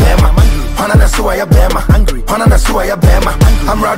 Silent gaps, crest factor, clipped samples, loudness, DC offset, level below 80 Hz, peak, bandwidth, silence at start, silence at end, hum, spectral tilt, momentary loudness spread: none; 8 dB; under 0.1%; -11 LUFS; under 0.1%; -10 dBFS; 0 dBFS; 16.5 kHz; 0 s; 0 s; none; -6 dB/octave; 3 LU